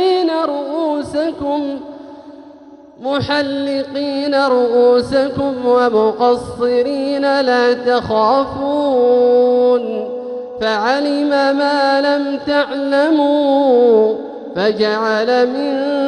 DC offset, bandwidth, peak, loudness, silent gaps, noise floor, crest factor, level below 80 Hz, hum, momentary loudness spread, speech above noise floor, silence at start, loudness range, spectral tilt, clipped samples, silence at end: under 0.1%; 10.5 kHz; -2 dBFS; -15 LUFS; none; -40 dBFS; 14 dB; -52 dBFS; none; 9 LU; 26 dB; 0 s; 6 LU; -5.5 dB/octave; under 0.1%; 0 s